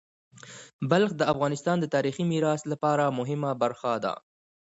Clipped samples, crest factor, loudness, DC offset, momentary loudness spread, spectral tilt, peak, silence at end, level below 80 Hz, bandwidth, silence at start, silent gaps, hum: under 0.1%; 18 dB; -27 LUFS; under 0.1%; 12 LU; -6 dB/octave; -10 dBFS; 0.65 s; -66 dBFS; 8 kHz; 0.45 s; 0.73-0.79 s; none